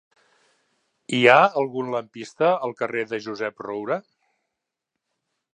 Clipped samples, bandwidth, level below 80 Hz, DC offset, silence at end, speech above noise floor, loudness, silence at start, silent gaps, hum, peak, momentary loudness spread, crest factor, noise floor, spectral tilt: under 0.1%; 10 kHz; -76 dBFS; under 0.1%; 1.55 s; 61 dB; -22 LUFS; 1.1 s; none; none; 0 dBFS; 15 LU; 24 dB; -83 dBFS; -5 dB/octave